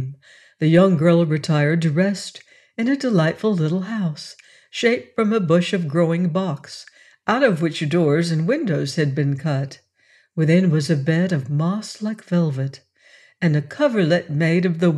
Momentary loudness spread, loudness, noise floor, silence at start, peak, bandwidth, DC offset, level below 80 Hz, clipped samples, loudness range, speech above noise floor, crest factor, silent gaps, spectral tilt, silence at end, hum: 12 LU; -20 LUFS; -58 dBFS; 0 s; -4 dBFS; 11.5 kHz; under 0.1%; -66 dBFS; under 0.1%; 3 LU; 39 dB; 16 dB; none; -7 dB/octave; 0 s; none